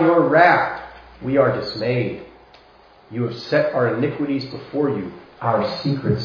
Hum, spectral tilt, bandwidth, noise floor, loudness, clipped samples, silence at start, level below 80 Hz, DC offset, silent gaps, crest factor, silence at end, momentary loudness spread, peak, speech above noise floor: none; -8 dB/octave; 5.4 kHz; -49 dBFS; -20 LUFS; under 0.1%; 0 s; -52 dBFS; under 0.1%; none; 20 dB; 0 s; 17 LU; 0 dBFS; 30 dB